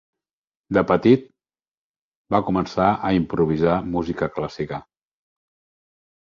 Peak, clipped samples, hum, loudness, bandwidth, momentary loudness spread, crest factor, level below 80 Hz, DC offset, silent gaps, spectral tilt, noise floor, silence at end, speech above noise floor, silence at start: -2 dBFS; under 0.1%; none; -21 LUFS; 7.4 kHz; 10 LU; 20 dB; -48 dBFS; under 0.1%; 1.68-2.25 s; -8 dB/octave; -87 dBFS; 1.5 s; 67 dB; 0.7 s